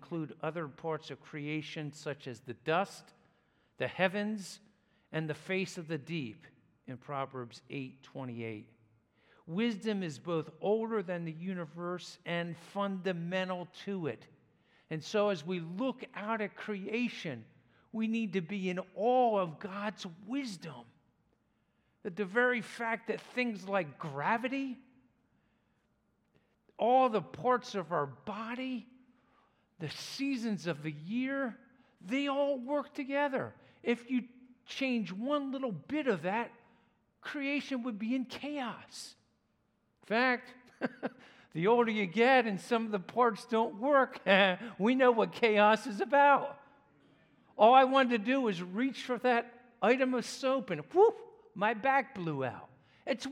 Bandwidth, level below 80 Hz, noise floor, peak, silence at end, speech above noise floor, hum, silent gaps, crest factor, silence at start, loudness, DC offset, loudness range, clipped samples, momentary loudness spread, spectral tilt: 13 kHz; -82 dBFS; -76 dBFS; -10 dBFS; 0 s; 43 dB; none; none; 24 dB; 0 s; -33 LUFS; under 0.1%; 11 LU; under 0.1%; 16 LU; -5.5 dB/octave